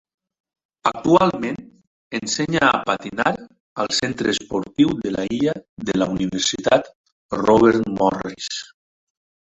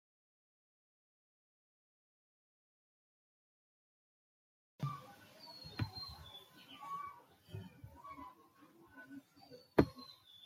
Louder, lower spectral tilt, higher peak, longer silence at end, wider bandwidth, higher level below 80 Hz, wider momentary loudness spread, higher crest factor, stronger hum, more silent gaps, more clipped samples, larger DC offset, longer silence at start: first, -20 LUFS vs -43 LUFS; second, -4.5 dB/octave vs -7 dB/octave; first, -2 dBFS vs -12 dBFS; first, 0.9 s vs 0 s; second, 8.4 kHz vs 16.5 kHz; first, -52 dBFS vs -66 dBFS; second, 12 LU vs 24 LU; second, 20 dB vs 34 dB; neither; first, 1.87-2.11 s, 3.60-3.76 s, 5.69-5.77 s, 6.95-7.04 s, 7.12-7.29 s vs none; neither; neither; second, 0.85 s vs 4.8 s